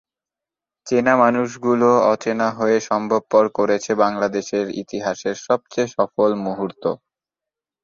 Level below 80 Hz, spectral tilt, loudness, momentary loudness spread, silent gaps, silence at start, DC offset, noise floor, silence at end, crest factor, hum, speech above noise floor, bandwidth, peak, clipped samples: -62 dBFS; -5.5 dB/octave; -19 LUFS; 10 LU; none; 0.85 s; under 0.1%; -88 dBFS; 0.9 s; 18 dB; none; 70 dB; 7.6 kHz; -2 dBFS; under 0.1%